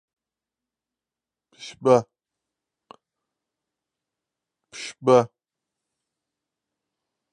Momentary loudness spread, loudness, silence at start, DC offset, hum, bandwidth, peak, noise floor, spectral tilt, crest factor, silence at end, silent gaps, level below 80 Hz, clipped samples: 22 LU; -21 LUFS; 1.6 s; under 0.1%; none; 9.6 kHz; -4 dBFS; -90 dBFS; -6 dB/octave; 26 dB; 2.05 s; none; -74 dBFS; under 0.1%